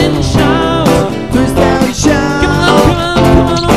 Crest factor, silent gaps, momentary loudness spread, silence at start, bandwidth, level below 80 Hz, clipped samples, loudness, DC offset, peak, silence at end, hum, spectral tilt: 10 dB; none; 4 LU; 0 s; 15.5 kHz; -22 dBFS; 0.8%; -10 LUFS; 2%; 0 dBFS; 0 s; none; -5.5 dB/octave